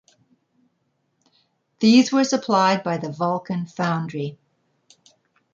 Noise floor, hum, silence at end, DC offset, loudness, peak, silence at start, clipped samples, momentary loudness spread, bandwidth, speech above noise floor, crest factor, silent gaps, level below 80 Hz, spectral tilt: -71 dBFS; none; 1.2 s; under 0.1%; -21 LUFS; -4 dBFS; 1.8 s; under 0.1%; 13 LU; 7.6 kHz; 51 dB; 18 dB; none; -70 dBFS; -5 dB/octave